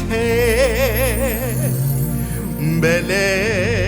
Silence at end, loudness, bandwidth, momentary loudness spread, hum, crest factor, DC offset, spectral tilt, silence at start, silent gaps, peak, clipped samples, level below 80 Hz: 0 s; -18 LUFS; over 20 kHz; 5 LU; none; 14 dB; under 0.1%; -5 dB/octave; 0 s; none; -4 dBFS; under 0.1%; -28 dBFS